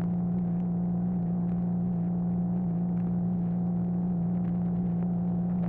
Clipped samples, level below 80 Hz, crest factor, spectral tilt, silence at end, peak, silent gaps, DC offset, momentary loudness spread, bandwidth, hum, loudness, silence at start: under 0.1%; -50 dBFS; 8 dB; -14 dB/octave; 0 s; -20 dBFS; none; under 0.1%; 0 LU; 2 kHz; none; -29 LUFS; 0 s